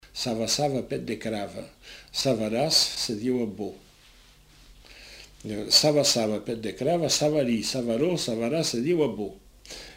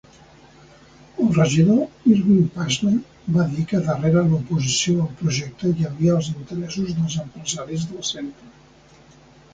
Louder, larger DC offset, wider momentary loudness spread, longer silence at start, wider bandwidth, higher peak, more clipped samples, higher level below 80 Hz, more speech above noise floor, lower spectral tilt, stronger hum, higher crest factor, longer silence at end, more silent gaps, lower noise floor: second, -25 LUFS vs -21 LUFS; neither; first, 20 LU vs 11 LU; second, 0.05 s vs 1.15 s; first, 16 kHz vs 9.4 kHz; second, -8 dBFS vs -4 dBFS; neither; second, -56 dBFS vs -50 dBFS; about the same, 28 dB vs 30 dB; second, -3.5 dB/octave vs -5.5 dB/octave; first, 50 Hz at -60 dBFS vs none; about the same, 20 dB vs 18 dB; second, 0 s vs 1.05 s; neither; first, -54 dBFS vs -50 dBFS